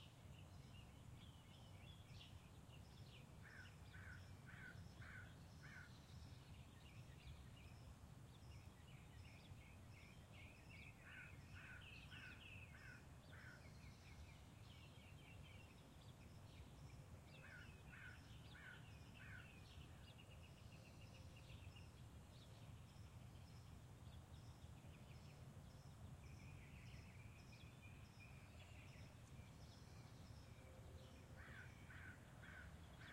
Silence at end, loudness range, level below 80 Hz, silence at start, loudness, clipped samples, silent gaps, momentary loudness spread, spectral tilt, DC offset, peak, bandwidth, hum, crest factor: 0 s; 2 LU; -70 dBFS; 0 s; -62 LUFS; under 0.1%; none; 3 LU; -5 dB/octave; under 0.1%; -46 dBFS; 16 kHz; none; 14 dB